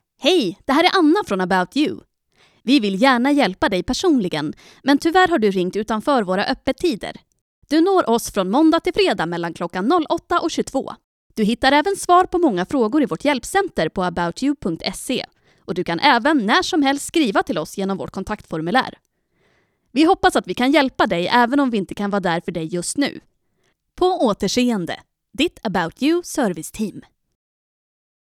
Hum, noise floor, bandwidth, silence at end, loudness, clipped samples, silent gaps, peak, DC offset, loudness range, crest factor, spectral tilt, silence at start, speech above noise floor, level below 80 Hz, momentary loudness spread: none; -67 dBFS; 15 kHz; 1.2 s; -19 LUFS; under 0.1%; 7.41-7.62 s, 11.04-11.30 s; 0 dBFS; under 0.1%; 4 LU; 20 dB; -4.5 dB/octave; 0.2 s; 48 dB; -48 dBFS; 10 LU